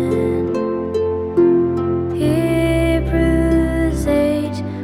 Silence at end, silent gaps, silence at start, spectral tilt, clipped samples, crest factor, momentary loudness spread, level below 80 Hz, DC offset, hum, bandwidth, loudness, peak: 0 s; none; 0 s; -7.5 dB/octave; under 0.1%; 12 dB; 5 LU; -28 dBFS; under 0.1%; none; 13.5 kHz; -17 LUFS; -4 dBFS